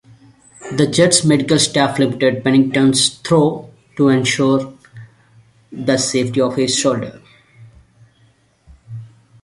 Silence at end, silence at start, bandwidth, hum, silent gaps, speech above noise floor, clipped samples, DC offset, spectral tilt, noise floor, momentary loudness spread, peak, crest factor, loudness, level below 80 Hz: 0.35 s; 0.6 s; 11.5 kHz; none; none; 40 dB; under 0.1%; under 0.1%; -4 dB/octave; -55 dBFS; 20 LU; 0 dBFS; 18 dB; -15 LUFS; -54 dBFS